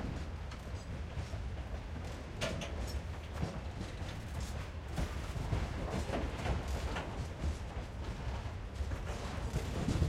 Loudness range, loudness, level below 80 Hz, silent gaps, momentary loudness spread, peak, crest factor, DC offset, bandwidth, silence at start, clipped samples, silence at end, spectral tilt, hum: 3 LU; -41 LUFS; -42 dBFS; none; 6 LU; -18 dBFS; 20 dB; under 0.1%; 14.5 kHz; 0 s; under 0.1%; 0 s; -6 dB/octave; none